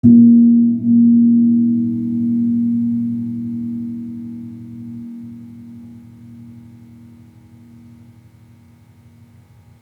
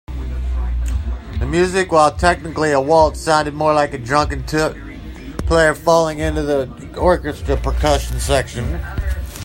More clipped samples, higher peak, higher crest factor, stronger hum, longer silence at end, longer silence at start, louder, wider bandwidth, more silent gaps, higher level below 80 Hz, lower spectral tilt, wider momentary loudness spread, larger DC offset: neither; about the same, -2 dBFS vs 0 dBFS; about the same, 16 dB vs 18 dB; neither; first, 3.2 s vs 0 s; about the same, 0.05 s vs 0.1 s; first, -14 LUFS vs -17 LUFS; second, 1 kHz vs 16.5 kHz; neither; second, -62 dBFS vs -26 dBFS; first, -12 dB/octave vs -5 dB/octave; first, 24 LU vs 11 LU; neither